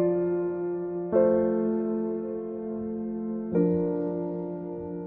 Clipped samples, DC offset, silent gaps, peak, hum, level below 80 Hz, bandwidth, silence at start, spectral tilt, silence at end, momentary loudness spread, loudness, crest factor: under 0.1%; under 0.1%; none; -12 dBFS; none; -60 dBFS; 2.6 kHz; 0 s; -13 dB/octave; 0 s; 10 LU; -28 LUFS; 16 dB